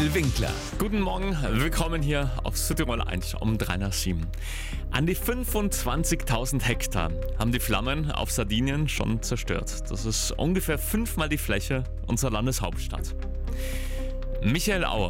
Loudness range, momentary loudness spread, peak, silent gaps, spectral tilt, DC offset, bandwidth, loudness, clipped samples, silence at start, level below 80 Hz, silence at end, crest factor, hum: 2 LU; 8 LU; -12 dBFS; none; -4.5 dB/octave; under 0.1%; 17 kHz; -28 LUFS; under 0.1%; 0 s; -30 dBFS; 0 s; 14 dB; none